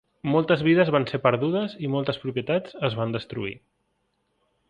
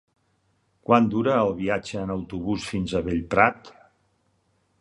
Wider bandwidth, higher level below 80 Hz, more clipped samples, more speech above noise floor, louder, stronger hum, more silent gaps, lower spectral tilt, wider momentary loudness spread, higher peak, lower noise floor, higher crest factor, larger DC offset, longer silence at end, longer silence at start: second, 8.6 kHz vs 11 kHz; second, -60 dBFS vs -48 dBFS; neither; first, 49 dB vs 45 dB; about the same, -24 LUFS vs -24 LUFS; neither; neither; first, -8.5 dB/octave vs -6.5 dB/octave; about the same, 10 LU vs 10 LU; about the same, -4 dBFS vs -4 dBFS; first, -73 dBFS vs -68 dBFS; about the same, 22 dB vs 22 dB; neither; about the same, 1.1 s vs 1.1 s; second, 0.25 s vs 0.9 s